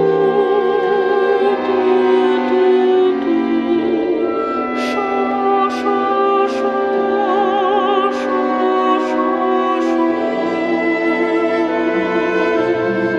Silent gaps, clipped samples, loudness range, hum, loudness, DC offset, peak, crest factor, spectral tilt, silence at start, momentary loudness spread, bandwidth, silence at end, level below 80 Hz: none; under 0.1%; 2 LU; none; -16 LUFS; under 0.1%; -4 dBFS; 12 dB; -6 dB/octave; 0 s; 4 LU; 7.8 kHz; 0 s; -56 dBFS